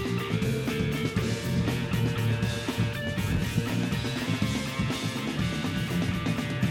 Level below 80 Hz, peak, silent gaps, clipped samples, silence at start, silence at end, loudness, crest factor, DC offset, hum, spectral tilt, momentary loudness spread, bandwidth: -44 dBFS; -12 dBFS; none; under 0.1%; 0 s; 0 s; -29 LUFS; 16 dB; under 0.1%; none; -5.5 dB/octave; 2 LU; 17 kHz